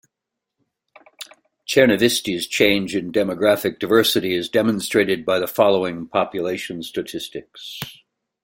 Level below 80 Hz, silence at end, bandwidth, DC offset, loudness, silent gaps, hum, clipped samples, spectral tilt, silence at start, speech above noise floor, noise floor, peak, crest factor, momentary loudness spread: -58 dBFS; 0.5 s; 16.5 kHz; under 0.1%; -19 LUFS; none; none; under 0.1%; -4 dB/octave; 1.2 s; 63 dB; -83 dBFS; 0 dBFS; 20 dB; 18 LU